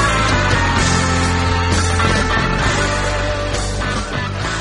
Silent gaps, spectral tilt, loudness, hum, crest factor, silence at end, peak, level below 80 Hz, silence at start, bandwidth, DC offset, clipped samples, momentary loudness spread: none; -4 dB/octave; -16 LUFS; none; 14 dB; 0 s; -2 dBFS; -24 dBFS; 0 s; 11.5 kHz; under 0.1%; under 0.1%; 6 LU